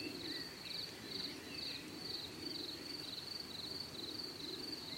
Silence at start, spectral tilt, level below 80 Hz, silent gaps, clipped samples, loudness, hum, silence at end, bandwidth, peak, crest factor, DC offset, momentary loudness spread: 0 s; -2.5 dB/octave; -74 dBFS; none; under 0.1%; -44 LUFS; none; 0 s; 16.5 kHz; -30 dBFS; 16 dB; under 0.1%; 1 LU